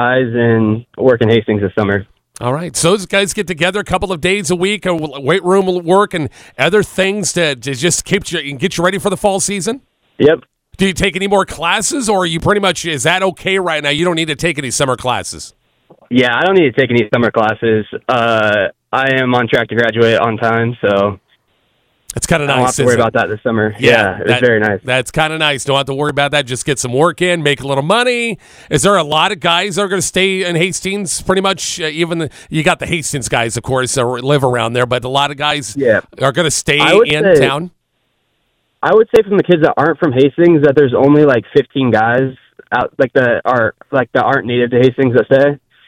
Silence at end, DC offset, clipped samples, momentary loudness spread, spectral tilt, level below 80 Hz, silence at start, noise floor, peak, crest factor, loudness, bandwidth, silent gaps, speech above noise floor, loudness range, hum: 0.3 s; under 0.1%; under 0.1%; 7 LU; -4.5 dB/octave; -42 dBFS; 0 s; -65 dBFS; 0 dBFS; 14 dB; -13 LUFS; 16.5 kHz; none; 52 dB; 4 LU; none